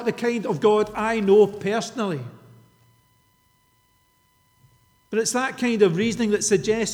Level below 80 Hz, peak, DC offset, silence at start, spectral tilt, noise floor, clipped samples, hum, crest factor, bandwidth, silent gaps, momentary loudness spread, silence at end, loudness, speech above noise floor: -58 dBFS; -6 dBFS; under 0.1%; 0 s; -4.5 dB/octave; -63 dBFS; under 0.1%; none; 18 dB; 14.5 kHz; none; 10 LU; 0 s; -22 LUFS; 42 dB